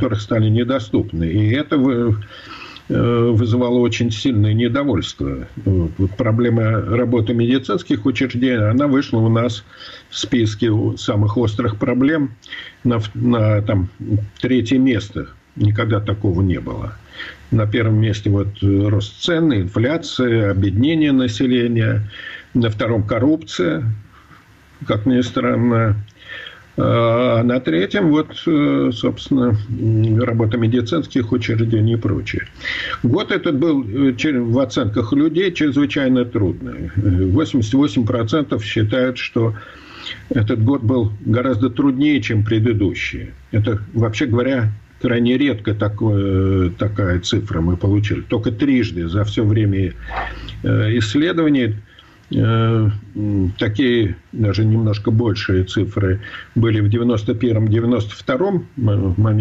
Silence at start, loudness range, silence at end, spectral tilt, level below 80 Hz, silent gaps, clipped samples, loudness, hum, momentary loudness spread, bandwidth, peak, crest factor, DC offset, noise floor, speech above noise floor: 0 s; 2 LU; 0 s; -7.5 dB/octave; -40 dBFS; none; under 0.1%; -18 LUFS; none; 8 LU; 7.8 kHz; -4 dBFS; 12 dB; under 0.1%; -46 dBFS; 29 dB